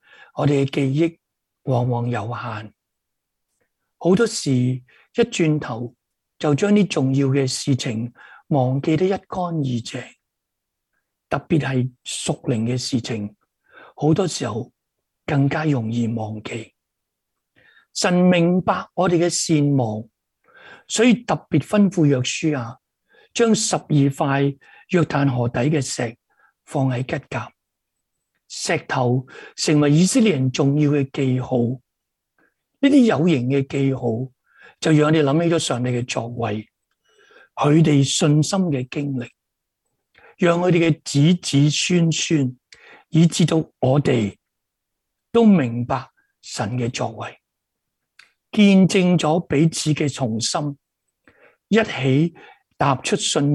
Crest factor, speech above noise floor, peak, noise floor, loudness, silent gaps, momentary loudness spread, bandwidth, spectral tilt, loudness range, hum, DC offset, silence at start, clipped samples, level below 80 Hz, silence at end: 18 dB; 61 dB; -2 dBFS; -80 dBFS; -20 LUFS; none; 13 LU; 12 kHz; -5.5 dB/octave; 6 LU; none; under 0.1%; 0.35 s; under 0.1%; -58 dBFS; 0 s